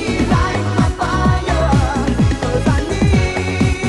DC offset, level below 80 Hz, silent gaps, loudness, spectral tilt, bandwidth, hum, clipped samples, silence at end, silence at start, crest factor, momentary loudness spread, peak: under 0.1%; -22 dBFS; none; -16 LUFS; -6.5 dB/octave; 11.5 kHz; none; under 0.1%; 0 s; 0 s; 14 dB; 2 LU; 0 dBFS